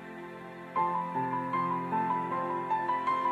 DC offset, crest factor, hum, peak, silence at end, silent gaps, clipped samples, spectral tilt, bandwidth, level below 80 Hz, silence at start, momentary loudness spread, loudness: under 0.1%; 14 dB; none; -18 dBFS; 0 s; none; under 0.1%; -7.5 dB/octave; 11.5 kHz; -78 dBFS; 0 s; 14 LU; -31 LUFS